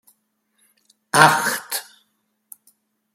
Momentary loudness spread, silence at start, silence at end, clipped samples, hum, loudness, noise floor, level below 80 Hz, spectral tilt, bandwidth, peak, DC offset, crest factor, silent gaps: 15 LU; 1.15 s; 1.3 s; under 0.1%; none; -17 LUFS; -69 dBFS; -66 dBFS; -2.5 dB/octave; 16.5 kHz; 0 dBFS; under 0.1%; 24 dB; none